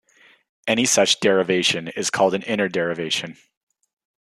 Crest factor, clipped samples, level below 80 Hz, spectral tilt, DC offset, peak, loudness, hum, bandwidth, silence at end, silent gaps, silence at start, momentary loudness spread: 20 dB; under 0.1%; -68 dBFS; -2.5 dB/octave; under 0.1%; -4 dBFS; -20 LUFS; none; 13.5 kHz; 0.9 s; none; 0.65 s; 8 LU